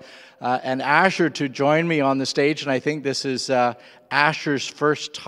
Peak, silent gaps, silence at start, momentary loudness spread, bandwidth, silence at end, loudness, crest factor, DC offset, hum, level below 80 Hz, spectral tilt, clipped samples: 0 dBFS; none; 0 s; 7 LU; 12.5 kHz; 0 s; -21 LUFS; 22 dB; under 0.1%; none; -74 dBFS; -4.5 dB/octave; under 0.1%